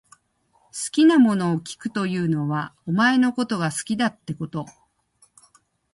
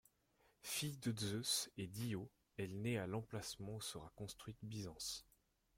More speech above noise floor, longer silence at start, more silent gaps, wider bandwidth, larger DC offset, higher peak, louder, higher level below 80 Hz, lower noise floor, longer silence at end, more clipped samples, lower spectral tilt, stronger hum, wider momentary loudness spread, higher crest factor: first, 43 dB vs 32 dB; about the same, 0.75 s vs 0.65 s; neither; second, 11.5 kHz vs 16.5 kHz; neither; first, -6 dBFS vs -26 dBFS; first, -22 LUFS vs -46 LUFS; first, -64 dBFS vs -72 dBFS; second, -65 dBFS vs -78 dBFS; first, 1.25 s vs 0.55 s; neither; first, -5.5 dB/octave vs -4 dB/octave; neither; about the same, 14 LU vs 12 LU; about the same, 16 dB vs 20 dB